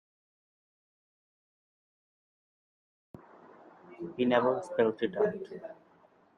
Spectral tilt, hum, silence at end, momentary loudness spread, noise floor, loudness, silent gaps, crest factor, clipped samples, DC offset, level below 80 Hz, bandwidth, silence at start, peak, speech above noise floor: -6.5 dB/octave; none; 0.65 s; 18 LU; -63 dBFS; -30 LUFS; none; 24 dB; under 0.1%; under 0.1%; -78 dBFS; 10 kHz; 3.85 s; -12 dBFS; 33 dB